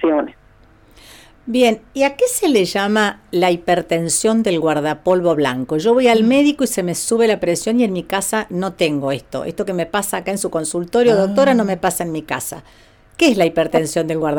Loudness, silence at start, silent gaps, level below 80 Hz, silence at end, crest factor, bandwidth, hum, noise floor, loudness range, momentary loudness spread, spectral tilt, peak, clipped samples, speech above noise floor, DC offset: -17 LUFS; 0 s; none; -50 dBFS; 0 s; 12 dB; 19 kHz; none; -48 dBFS; 3 LU; 9 LU; -4.5 dB/octave; -4 dBFS; under 0.1%; 32 dB; under 0.1%